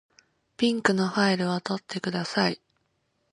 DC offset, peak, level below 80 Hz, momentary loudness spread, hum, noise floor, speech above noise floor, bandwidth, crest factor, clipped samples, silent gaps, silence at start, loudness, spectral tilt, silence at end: under 0.1%; -6 dBFS; -70 dBFS; 7 LU; none; -73 dBFS; 48 dB; 11 kHz; 22 dB; under 0.1%; none; 0.6 s; -26 LUFS; -5 dB/octave; 0.75 s